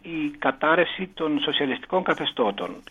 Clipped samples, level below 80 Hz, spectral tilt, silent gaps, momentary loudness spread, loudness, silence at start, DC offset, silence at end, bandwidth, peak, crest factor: under 0.1%; -60 dBFS; -6 dB/octave; none; 7 LU; -24 LUFS; 0.05 s; under 0.1%; 0.1 s; 9.6 kHz; -6 dBFS; 18 dB